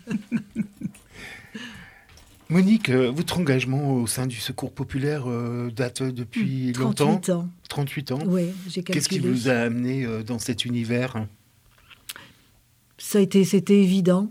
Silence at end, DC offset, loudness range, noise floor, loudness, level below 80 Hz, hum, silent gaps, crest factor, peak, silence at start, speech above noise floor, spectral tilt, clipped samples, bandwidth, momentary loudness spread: 0 s; under 0.1%; 3 LU; -60 dBFS; -24 LUFS; -58 dBFS; none; none; 18 dB; -6 dBFS; 0.05 s; 37 dB; -5.5 dB/octave; under 0.1%; 16 kHz; 19 LU